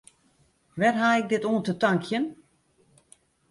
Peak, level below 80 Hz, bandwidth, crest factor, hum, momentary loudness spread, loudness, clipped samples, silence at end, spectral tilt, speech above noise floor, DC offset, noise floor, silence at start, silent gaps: -8 dBFS; -68 dBFS; 11.5 kHz; 18 dB; none; 8 LU; -25 LUFS; under 0.1%; 1.15 s; -6 dB/octave; 41 dB; under 0.1%; -65 dBFS; 0.75 s; none